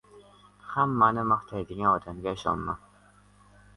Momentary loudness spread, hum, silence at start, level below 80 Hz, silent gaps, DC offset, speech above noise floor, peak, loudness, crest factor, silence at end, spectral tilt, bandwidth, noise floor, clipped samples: 14 LU; 50 Hz at -50 dBFS; 0.15 s; -54 dBFS; none; under 0.1%; 31 dB; -8 dBFS; -27 LUFS; 20 dB; 1 s; -7 dB/octave; 11.5 kHz; -58 dBFS; under 0.1%